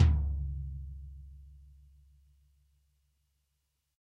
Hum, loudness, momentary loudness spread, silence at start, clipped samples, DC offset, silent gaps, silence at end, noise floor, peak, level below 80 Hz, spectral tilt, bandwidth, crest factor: none; -35 LUFS; 24 LU; 0 s; under 0.1%; under 0.1%; none; 2.45 s; -81 dBFS; -12 dBFS; -38 dBFS; -8 dB/octave; 5 kHz; 24 dB